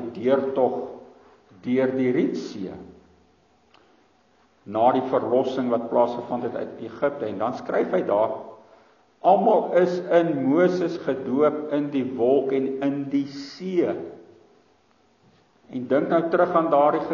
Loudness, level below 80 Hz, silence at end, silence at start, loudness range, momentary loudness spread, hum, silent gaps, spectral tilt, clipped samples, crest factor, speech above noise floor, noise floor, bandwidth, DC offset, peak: -23 LUFS; -70 dBFS; 0 s; 0 s; 7 LU; 14 LU; none; none; -6 dB/octave; under 0.1%; 18 dB; 39 dB; -62 dBFS; 7.2 kHz; under 0.1%; -6 dBFS